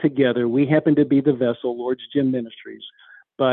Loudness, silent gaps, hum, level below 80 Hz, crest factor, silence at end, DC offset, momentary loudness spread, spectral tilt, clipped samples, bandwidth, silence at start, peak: -20 LUFS; none; none; -62 dBFS; 16 dB; 0 s; under 0.1%; 20 LU; -11 dB/octave; under 0.1%; 4.1 kHz; 0 s; -4 dBFS